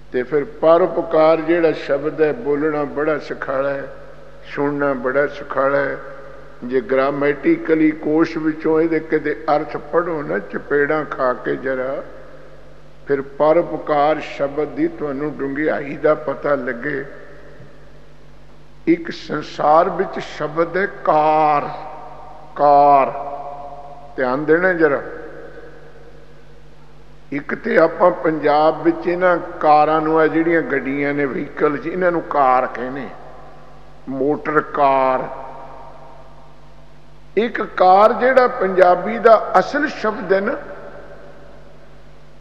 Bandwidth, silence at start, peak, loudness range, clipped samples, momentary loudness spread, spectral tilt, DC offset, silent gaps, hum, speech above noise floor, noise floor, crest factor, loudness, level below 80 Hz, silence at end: 7.6 kHz; 0.1 s; 0 dBFS; 6 LU; under 0.1%; 17 LU; -7 dB/octave; 2%; none; none; 28 dB; -45 dBFS; 18 dB; -17 LUFS; -50 dBFS; 1.1 s